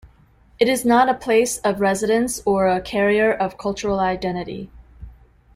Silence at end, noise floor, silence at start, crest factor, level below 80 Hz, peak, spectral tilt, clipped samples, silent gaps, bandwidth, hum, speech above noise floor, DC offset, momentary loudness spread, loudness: 0.45 s; -53 dBFS; 0.05 s; 16 dB; -46 dBFS; -4 dBFS; -4.5 dB/octave; under 0.1%; none; 15.5 kHz; none; 34 dB; under 0.1%; 10 LU; -19 LUFS